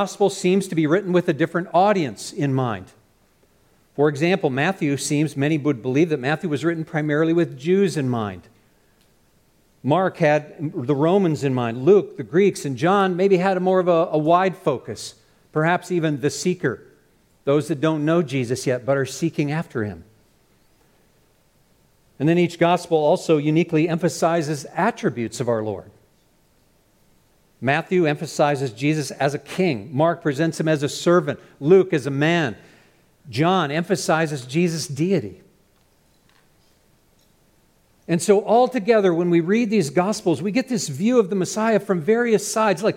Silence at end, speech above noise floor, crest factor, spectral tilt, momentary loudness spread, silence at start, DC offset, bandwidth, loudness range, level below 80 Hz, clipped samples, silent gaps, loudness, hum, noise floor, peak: 0 s; 40 dB; 18 dB; -6 dB/octave; 8 LU; 0 s; under 0.1%; 16.5 kHz; 6 LU; -64 dBFS; under 0.1%; none; -21 LUFS; none; -60 dBFS; -4 dBFS